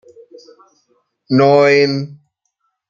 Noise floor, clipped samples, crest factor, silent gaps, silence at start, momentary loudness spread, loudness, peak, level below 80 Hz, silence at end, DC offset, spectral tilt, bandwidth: -70 dBFS; under 0.1%; 16 dB; none; 1.3 s; 14 LU; -13 LUFS; -2 dBFS; -64 dBFS; 0.75 s; under 0.1%; -6.5 dB/octave; 7.4 kHz